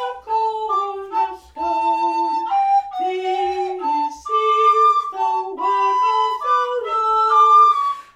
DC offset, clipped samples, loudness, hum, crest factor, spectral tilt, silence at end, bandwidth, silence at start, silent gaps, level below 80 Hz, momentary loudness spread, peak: under 0.1%; under 0.1%; -18 LUFS; none; 14 dB; -2.5 dB/octave; 0.15 s; 9.6 kHz; 0 s; none; -60 dBFS; 10 LU; -4 dBFS